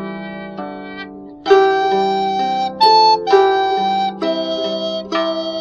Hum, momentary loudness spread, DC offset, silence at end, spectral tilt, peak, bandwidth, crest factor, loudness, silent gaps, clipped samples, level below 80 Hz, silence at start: none; 17 LU; under 0.1%; 0 s; -4.5 dB/octave; 0 dBFS; 7.4 kHz; 16 dB; -15 LUFS; none; under 0.1%; -56 dBFS; 0 s